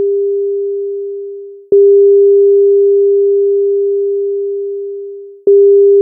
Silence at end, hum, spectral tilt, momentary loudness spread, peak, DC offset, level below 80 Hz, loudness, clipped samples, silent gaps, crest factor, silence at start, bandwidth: 0 s; none; -14 dB/octave; 16 LU; -2 dBFS; under 0.1%; -66 dBFS; -10 LUFS; under 0.1%; none; 8 dB; 0 s; 0.7 kHz